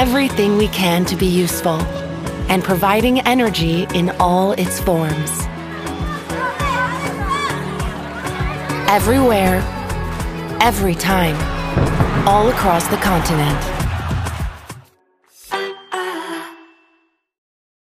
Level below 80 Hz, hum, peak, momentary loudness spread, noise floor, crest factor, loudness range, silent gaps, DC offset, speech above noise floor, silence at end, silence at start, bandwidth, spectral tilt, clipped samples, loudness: -30 dBFS; none; 0 dBFS; 11 LU; -61 dBFS; 18 dB; 7 LU; none; under 0.1%; 46 dB; 1.3 s; 0 s; 15.5 kHz; -5 dB/octave; under 0.1%; -18 LUFS